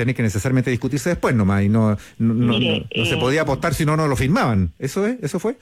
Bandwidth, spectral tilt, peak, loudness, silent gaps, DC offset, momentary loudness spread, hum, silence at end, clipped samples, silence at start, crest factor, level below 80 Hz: 16 kHz; -6 dB/octave; -8 dBFS; -19 LUFS; none; under 0.1%; 5 LU; none; 0.05 s; under 0.1%; 0 s; 12 dB; -40 dBFS